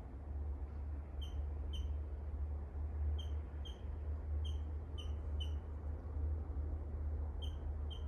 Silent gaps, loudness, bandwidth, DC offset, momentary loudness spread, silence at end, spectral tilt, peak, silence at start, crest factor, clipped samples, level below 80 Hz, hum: none; -44 LUFS; 6.6 kHz; under 0.1%; 4 LU; 0 s; -7.5 dB/octave; -32 dBFS; 0 s; 10 dB; under 0.1%; -42 dBFS; none